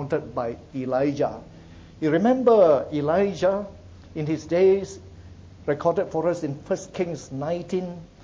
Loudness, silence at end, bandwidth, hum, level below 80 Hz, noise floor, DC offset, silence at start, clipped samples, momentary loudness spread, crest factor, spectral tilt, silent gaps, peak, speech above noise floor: -24 LUFS; 0.2 s; 7.8 kHz; none; -52 dBFS; -44 dBFS; under 0.1%; 0 s; under 0.1%; 14 LU; 18 dB; -7 dB/octave; none; -6 dBFS; 21 dB